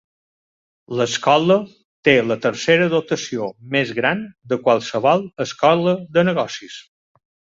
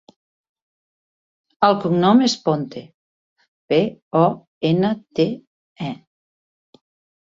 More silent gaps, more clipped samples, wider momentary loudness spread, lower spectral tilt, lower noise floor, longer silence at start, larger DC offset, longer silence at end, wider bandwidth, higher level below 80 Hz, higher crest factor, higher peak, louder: second, 1.85-2.03 s vs 2.94-3.36 s, 3.48-3.68 s, 4.02-4.11 s, 4.47-4.61 s, 5.47-5.76 s; neither; second, 11 LU vs 16 LU; second, -5 dB/octave vs -6.5 dB/octave; about the same, under -90 dBFS vs under -90 dBFS; second, 0.9 s vs 1.6 s; neither; second, 0.8 s vs 1.3 s; about the same, 7.8 kHz vs 7.8 kHz; about the same, -62 dBFS vs -62 dBFS; about the same, 18 dB vs 20 dB; about the same, -2 dBFS vs -2 dBFS; about the same, -18 LUFS vs -19 LUFS